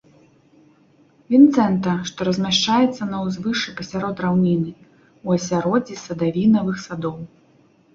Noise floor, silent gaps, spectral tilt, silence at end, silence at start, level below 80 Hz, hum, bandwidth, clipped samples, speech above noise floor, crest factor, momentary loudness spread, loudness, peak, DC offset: -55 dBFS; none; -5.5 dB/octave; 0.7 s; 1.3 s; -56 dBFS; none; 7.6 kHz; under 0.1%; 36 dB; 18 dB; 14 LU; -20 LUFS; -2 dBFS; under 0.1%